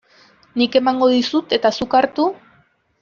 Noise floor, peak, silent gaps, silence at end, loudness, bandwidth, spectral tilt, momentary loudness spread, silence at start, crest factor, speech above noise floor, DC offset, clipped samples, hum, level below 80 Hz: -57 dBFS; -2 dBFS; none; 0.65 s; -17 LUFS; 7.2 kHz; -4.5 dB/octave; 6 LU; 0.55 s; 16 dB; 41 dB; under 0.1%; under 0.1%; none; -58 dBFS